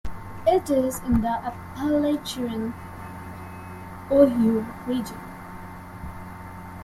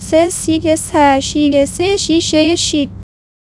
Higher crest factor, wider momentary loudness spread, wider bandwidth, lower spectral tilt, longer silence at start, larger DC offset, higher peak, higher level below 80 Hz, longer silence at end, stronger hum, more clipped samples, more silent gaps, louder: first, 20 dB vs 14 dB; first, 20 LU vs 4 LU; first, 15.5 kHz vs 12 kHz; first, -6.5 dB/octave vs -3.5 dB/octave; about the same, 0.05 s vs 0 s; neither; second, -4 dBFS vs 0 dBFS; second, -44 dBFS vs -38 dBFS; second, 0 s vs 0.4 s; neither; neither; neither; second, -24 LUFS vs -13 LUFS